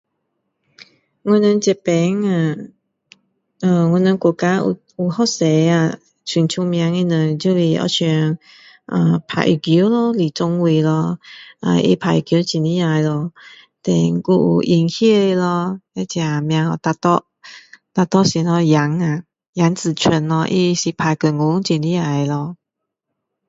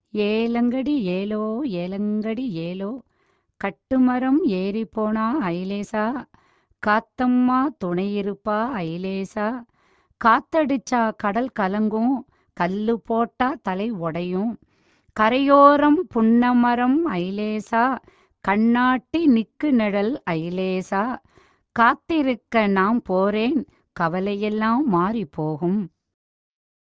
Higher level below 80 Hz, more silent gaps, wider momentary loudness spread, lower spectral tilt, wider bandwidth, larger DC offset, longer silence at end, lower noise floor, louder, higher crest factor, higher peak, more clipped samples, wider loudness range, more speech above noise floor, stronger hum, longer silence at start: about the same, -58 dBFS vs -56 dBFS; first, 19.48-19.53 s vs none; about the same, 8 LU vs 10 LU; about the same, -6 dB/octave vs -7 dB/octave; about the same, 7.8 kHz vs 7.8 kHz; neither; about the same, 0.95 s vs 1 s; first, -79 dBFS vs -67 dBFS; first, -17 LUFS vs -22 LUFS; about the same, 16 dB vs 20 dB; about the same, 0 dBFS vs -2 dBFS; neither; second, 2 LU vs 6 LU; first, 63 dB vs 46 dB; neither; first, 0.8 s vs 0.15 s